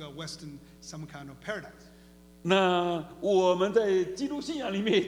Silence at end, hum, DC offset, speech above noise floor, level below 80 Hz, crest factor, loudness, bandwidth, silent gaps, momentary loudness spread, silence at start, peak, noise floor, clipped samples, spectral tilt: 0 s; 60 Hz at -55 dBFS; under 0.1%; 25 dB; -60 dBFS; 18 dB; -28 LUFS; 13 kHz; none; 19 LU; 0 s; -10 dBFS; -54 dBFS; under 0.1%; -5 dB/octave